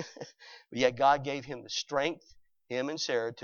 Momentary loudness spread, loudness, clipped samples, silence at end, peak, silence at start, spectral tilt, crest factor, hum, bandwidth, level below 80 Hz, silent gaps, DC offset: 20 LU; -31 LUFS; under 0.1%; 0 s; -10 dBFS; 0 s; -3.5 dB/octave; 24 dB; none; 7.4 kHz; -68 dBFS; none; under 0.1%